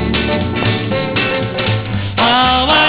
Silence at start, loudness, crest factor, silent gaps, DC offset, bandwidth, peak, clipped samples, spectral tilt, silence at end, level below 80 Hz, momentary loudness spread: 0 s; -14 LUFS; 14 dB; none; 0.3%; 4 kHz; 0 dBFS; under 0.1%; -9 dB/octave; 0 s; -30 dBFS; 7 LU